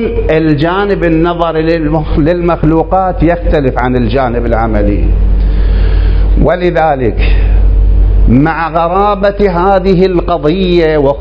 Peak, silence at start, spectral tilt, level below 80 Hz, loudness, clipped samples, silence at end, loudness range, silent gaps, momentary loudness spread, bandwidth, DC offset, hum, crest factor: 0 dBFS; 0 s; -9.5 dB/octave; -12 dBFS; -10 LUFS; 0.6%; 0 s; 2 LU; none; 3 LU; 5.4 kHz; under 0.1%; none; 8 dB